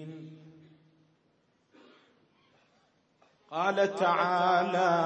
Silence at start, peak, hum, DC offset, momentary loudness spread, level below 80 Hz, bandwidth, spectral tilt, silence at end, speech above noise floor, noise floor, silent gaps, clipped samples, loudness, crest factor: 0 s; -12 dBFS; none; under 0.1%; 20 LU; -88 dBFS; 8.6 kHz; -5.5 dB/octave; 0 s; 44 dB; -71 dBFS; none; under 0.1%; -27 LUFS; 20 dB